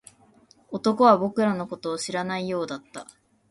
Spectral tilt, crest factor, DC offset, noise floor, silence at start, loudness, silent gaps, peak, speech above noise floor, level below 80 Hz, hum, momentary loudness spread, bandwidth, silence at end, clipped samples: -5.5 dB/octave; 20 dB; under 0.1%; -57 dBFS; 0.7 s; -24 LUFS; none; -4 dBFS; 34 dB; -68 dBFS; none; 18 LU; 11.5 kHz; 0.45 s; under 0.1%